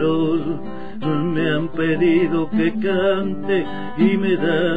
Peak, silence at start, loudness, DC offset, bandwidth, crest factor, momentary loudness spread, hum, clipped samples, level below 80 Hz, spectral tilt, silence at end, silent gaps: -4 dBFS; 0 s; -20 LUFS; 4%; 4.9 kHz; 14 dB; 9 LU; none; under 0.1%; -48 dBFS; -9 dB/octave; 0 s; none